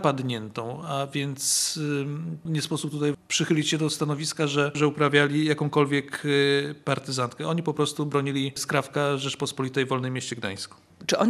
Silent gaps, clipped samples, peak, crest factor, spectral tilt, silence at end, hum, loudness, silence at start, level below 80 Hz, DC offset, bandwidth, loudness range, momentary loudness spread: none; under 0.1%; -4 dBFS; 22 dB; -4 dB/octave; 0 s; none; -26 LUFS; 0 s; -72 dBFS; under 0.1%; 14.5 kHz; 4 LU; 9 LU